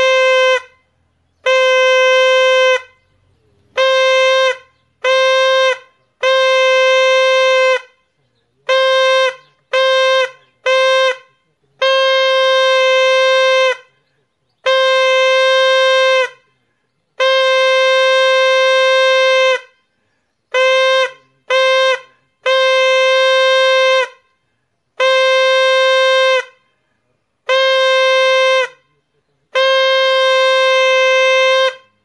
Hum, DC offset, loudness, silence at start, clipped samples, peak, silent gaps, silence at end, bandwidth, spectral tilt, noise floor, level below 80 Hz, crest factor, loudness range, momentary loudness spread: none; under 0.1%; -12 LUFS; 0 s; under 0.1%; 0 dBFS; none; 0.3 s; 9.4 kHz; 2.5 dB/octave; -67 dBFS; -76 dBFS; 12 dB; 2 LU; 8 LU